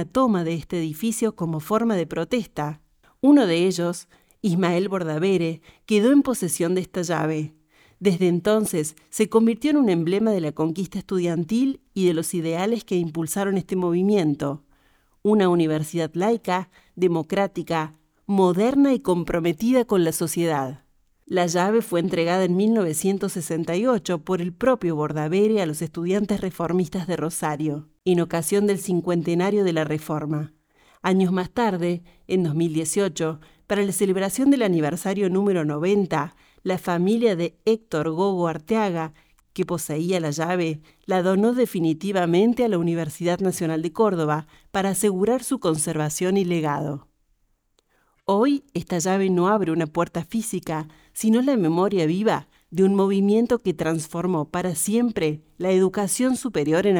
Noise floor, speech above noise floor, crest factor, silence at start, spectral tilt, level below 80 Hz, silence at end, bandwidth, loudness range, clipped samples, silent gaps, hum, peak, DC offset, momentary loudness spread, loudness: -67 dBFS; 45 dB; 16 dB; 0 s; -6 dB/octave; -56 dBFS; 0 s; over 20 kHz; 2 LU; under 0.1%; none; none; -6 dBFS; under 0.1%; 8 LU; -23 LUFS